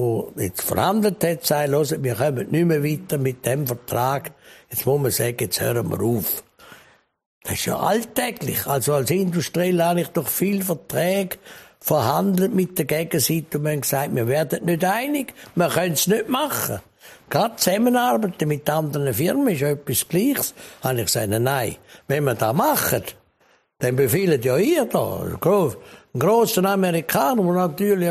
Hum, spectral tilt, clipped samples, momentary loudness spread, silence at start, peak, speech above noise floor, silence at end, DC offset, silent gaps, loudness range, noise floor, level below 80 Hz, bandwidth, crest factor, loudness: none; -5 dB/octave; under 0.1%; 7 LU; 0 s; -2 dBFS; 40 dB; 0 s; under 0.1%; 7.26-7.41 s; 3 LU; -61 dBFS; -56 dBFS; 15.5 kHz; 18 dB; -21 LUFS